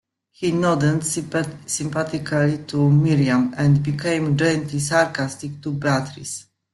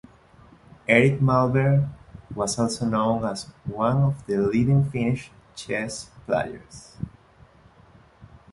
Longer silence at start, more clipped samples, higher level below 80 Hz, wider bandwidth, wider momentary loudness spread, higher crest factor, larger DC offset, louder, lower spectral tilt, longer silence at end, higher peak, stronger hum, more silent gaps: second, 0.4 s vs 0.9 s; neither; about the same, -54 dBFS vs -50 dBFS; about the same, 12.5 kHz vs 11.5 kHz; second, 10 LU vs 18 LU; about the same, 18 dB vs 22 dB; neither; about the same, -21 LUFS vs -23 LUFS; about the same, -5.5 dB/octave vs -6.5 dB/octave; about the same, 0.3 s vs 0.25 s; about the same, -2 dBFS vs -2 dBFS; neither; neither